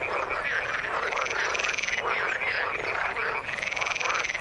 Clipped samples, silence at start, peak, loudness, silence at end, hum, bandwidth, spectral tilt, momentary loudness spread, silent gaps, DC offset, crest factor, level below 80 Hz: under 0.1%; 0 s; -10 dBFS; -27 LUFS; 0 s; none; 11.5 kHz; -1 dB/octave; 3 LU; none; under 0.1%; 18 dB; -56 dBFS